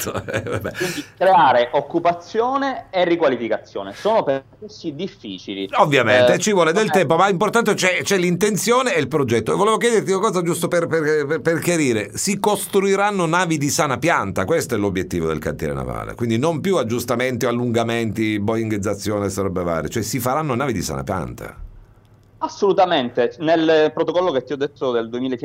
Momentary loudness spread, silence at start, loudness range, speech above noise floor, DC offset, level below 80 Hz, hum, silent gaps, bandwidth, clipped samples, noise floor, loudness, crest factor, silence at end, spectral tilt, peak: 10 LU; 0 s; 5 LU; 31 dB; under 0.1%; -48 dBFS; none; none; 16 kHz; under 0.1%; -50 dBFS; -19 LUFS; 18 dB; 0 s; -4.5 dB/octave; 0 dBFS